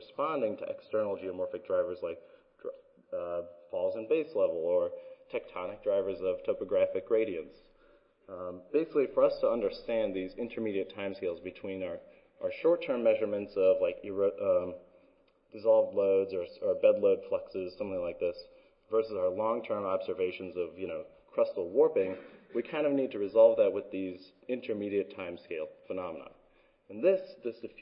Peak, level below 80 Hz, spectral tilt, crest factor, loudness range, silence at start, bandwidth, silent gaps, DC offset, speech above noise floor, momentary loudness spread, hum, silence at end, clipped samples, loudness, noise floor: -12 dBFS; -68 dBFS; -9.5 dB/octave; 20 dB; 6 LU; 0 s; 5.4 kHz; none; under 0.1%; 35 dB; 14 LU; none; 0 s; under 0.1%; -32 LUFS; -66 dBFS